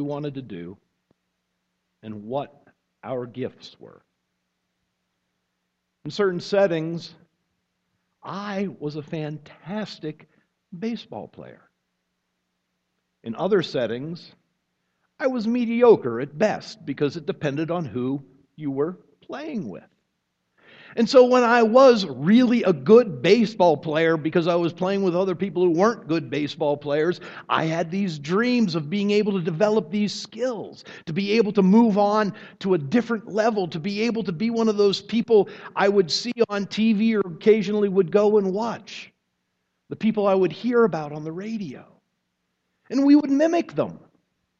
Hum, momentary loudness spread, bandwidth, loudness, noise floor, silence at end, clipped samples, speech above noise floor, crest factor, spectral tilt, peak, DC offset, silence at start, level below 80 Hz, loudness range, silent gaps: none; 18 LU; 8 kHz; -22 LUFS; -77 dBFS; 0.65 s; under 0.1%; 55 dB; 20 dB; -6.5 dB/octave; -4 dBFS; under 0.1%; 0 s; -68 dBFS; 17 LU; none